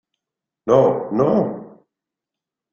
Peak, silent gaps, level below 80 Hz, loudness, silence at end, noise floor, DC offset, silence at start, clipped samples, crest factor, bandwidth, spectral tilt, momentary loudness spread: -2 dBFS; none; -58 dBFS; -18 LUFS; 1.05 s; -86 dBFS; under 0.1%; 0.65 s; under 0.1%; 18 dB; 7 kHz; -8.5 dB/octave; 15 LU